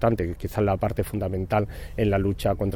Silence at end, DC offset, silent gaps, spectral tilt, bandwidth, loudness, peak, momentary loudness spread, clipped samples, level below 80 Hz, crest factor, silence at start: 0 s; under 0.1%; none; -7.5 dB/octave; 18.5 kHz; -26 LUFS; -8 dBFS; 5 LU; under 0.1%; -38 dBFS; 16 dB; 0 s